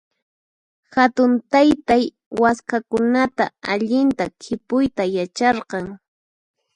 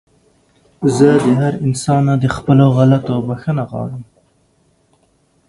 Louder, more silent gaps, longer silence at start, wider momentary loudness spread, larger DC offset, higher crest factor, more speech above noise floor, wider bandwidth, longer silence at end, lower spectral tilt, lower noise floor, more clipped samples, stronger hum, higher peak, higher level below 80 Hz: second, -19 LUFS vs -14 LUFS; first, 2.26-2.31 s vs none; about the same, 0.9 s vs 0.8 s; about the same, 10 LU vs 12 LU; neither; about the same, 18 dB vs 16 dB; first, over 71 dB vs 44 dB; about the same, 10.5 kHz vs 11.5 kHz; second, 0.8 s vs 1.45 s; second, -5.5 dB/octave vs -7.5 dB/octave; first, under -90 dBFS vs -58 dBFS; neither; neither; about the same, 0 dBFS vs 0 dBFS; second, -54 dBFS vs -46 dBFS